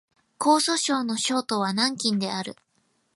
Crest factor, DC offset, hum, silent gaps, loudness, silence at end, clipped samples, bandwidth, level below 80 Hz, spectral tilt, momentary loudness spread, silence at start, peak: 18 dB; under 0.1%; none; none; -24 LUFS; 0.65 s; under 0.1%; 11.5 kHz; -74 dBFS; -3 dB/octave; 8 LU; 0.4 s; -8 dBFS